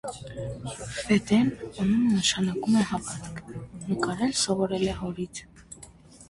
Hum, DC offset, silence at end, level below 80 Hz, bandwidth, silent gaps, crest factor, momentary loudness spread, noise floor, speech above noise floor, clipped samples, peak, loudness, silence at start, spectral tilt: none; under 0.1%; 0.05 s; -52 dBFS; 11.5 kHz; none; 18 dB; 17 LU; -50 dBFS; 23 dB; under 0.1%; -8 dBFS; -26 LUFS; 0.05 s; -4.5 dB/octave